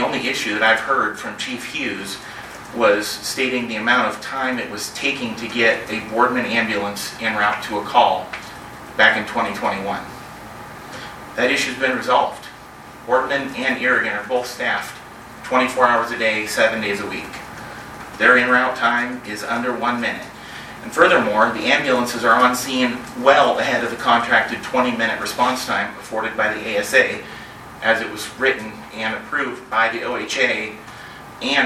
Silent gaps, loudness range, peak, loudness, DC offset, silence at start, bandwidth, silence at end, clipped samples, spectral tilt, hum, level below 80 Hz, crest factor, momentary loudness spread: none; 5 LU; 0 dBFS; -19 LUFS; under 0.1%; 0 s; 16 kHz; 0 s; under 0.1%; -3 dB/octave; none; -54 dBFS; 20 dB; 18 LU